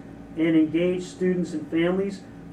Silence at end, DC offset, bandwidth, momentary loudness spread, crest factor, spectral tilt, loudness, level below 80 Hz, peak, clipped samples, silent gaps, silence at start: 0 s; under 0.1%; 9.6 kHz; 10 LU; 14 dB; -7 dB/octave; -24 LUFS; -54 dBFS; -12 dBFS; under 0.1%; none; 0 s